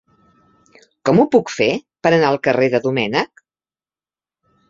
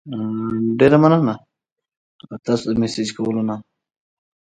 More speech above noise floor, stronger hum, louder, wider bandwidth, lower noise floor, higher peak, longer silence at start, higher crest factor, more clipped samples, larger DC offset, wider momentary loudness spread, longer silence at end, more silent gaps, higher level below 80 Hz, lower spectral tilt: first, over 74 dB vs 64 dB; neither; about the same, -17 LUFS vs -18 LUFS; second, 7.8 kHz vs 9.2 kHz; first, under -90 dBFS vs -82 dBFS; about the same, -2 dBFS vs 0 dBFS; first, 1.05 s vs 0.05 s; about the same, 18 dB vs 20 dB; neither; neither; second, 7 LU vs 18 LU; first, 1.45 s vs 0.9 s; second, none vs 1.72-1.76 s, 1.97-2.19 s; about the same, -58 dBFS vs -54 dBFS; about the same, -6 dB/octave vs -7 dB/octave